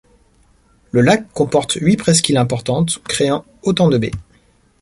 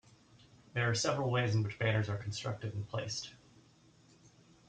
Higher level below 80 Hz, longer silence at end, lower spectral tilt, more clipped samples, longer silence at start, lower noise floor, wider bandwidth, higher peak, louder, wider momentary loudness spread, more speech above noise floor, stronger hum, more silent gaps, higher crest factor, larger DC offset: first, -46 dBFS vs -68 dBFS; first, 0.6 s vs 0.4 s; about the same, -5 dB/octave vs -4.5 dB/octave; neither; first, 0.95 s vs 0.75 s; second, -54 dBFS vs -64 dBFS; first, 11.5 kHz vs 9.2 kHz; first, 0 dBFS vs -20 dBFS; first, -16 LUFS vs -35 LUFS; about the same, 7 LU vs 9 LU; first, 39 dB vs 30 dB; neither; neither; about the same, 16 dB vs 18 dB; neither